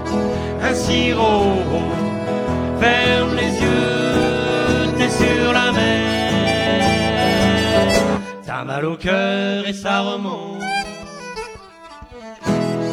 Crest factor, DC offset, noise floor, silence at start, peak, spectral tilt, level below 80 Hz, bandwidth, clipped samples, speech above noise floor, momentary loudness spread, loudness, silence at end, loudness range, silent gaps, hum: 16 dB; under 0.1%; -39 dBFS; 0 s; -2 dBFS; -5 dB/octave; -36 dBFS; 15.5 kHz; under 0.1%; 21 dB; 12 LU; -18 LUFS; 0 s; 6 LU; none; none